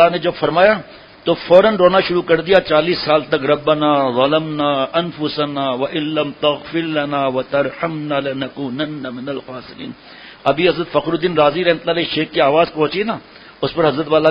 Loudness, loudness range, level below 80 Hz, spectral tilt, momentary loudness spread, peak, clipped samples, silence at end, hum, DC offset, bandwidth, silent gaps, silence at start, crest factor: -16 LUFS; 7 LU; -52 dBFS; -8 dB/octave; 11 LU; 0 dBFS; under 0.1%; 0 s; none; under 0.1%; 5.4 kHz; none; 0 s; 16 dB